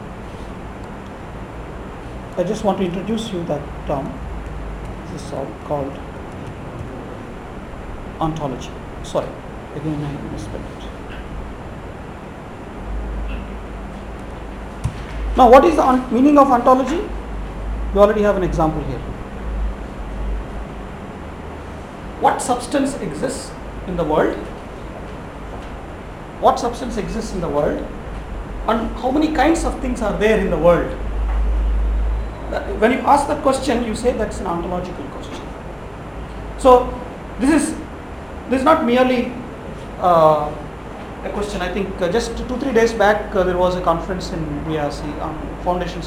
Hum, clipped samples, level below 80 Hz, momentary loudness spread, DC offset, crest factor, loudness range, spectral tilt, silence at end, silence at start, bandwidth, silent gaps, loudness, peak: none; under 0.1%; -30 dBFS; 18 LU; under 0.1%; 20 dB; 13 LU; -6 dB/octave; 0 s; 0 s; 16 kHz; none; -19 LUFS; 0 dBFS